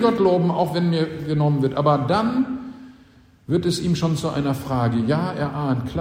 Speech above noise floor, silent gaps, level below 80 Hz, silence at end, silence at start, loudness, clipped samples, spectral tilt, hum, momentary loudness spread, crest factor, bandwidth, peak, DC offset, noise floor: 31 dB; none; -48 dBFS; 0 s; 0 s; -21 LUFS; under 0.1%; -7 dB/octave; none; 6 LU; 16 dB; 16 kHz; -6 dBFS; under 0.1%; -51 dBFS